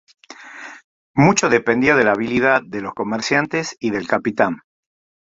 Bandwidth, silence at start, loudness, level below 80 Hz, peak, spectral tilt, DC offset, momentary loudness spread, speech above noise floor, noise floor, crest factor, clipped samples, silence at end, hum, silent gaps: 8 kHz; 0.3 s; -18 LUFS; -54 dBFS; 0 dBFS; -5 dB/octave; under 0.1%; 20 LU; 20 dB; -38 dBFS; 18 dB; under 0.1%; 0.65 s; none; 0.84-1.14 s